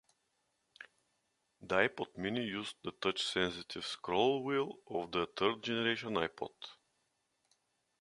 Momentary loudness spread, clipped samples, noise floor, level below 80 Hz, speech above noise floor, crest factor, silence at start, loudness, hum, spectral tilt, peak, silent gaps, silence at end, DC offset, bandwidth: 16 LU; under 0.1%; -81 dBFS; -70 dBFS; 45 dB; 26 dB; 0.8 s; -36 LUFS; none; -4.5 dB/octave; -12 dBFS; none; 1.3 s; under 0.1%; 11.5 kHz